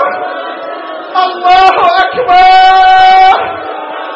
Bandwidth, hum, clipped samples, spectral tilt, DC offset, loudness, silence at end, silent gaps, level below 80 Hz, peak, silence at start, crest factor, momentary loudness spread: 7.6 kHz; none; 0.3%; -3 dB/octave; under 0.1%; -6 LUFS; 0 s; none; -38 dBFS; 0 dBFS; 0 s; 8 dB; 16 LU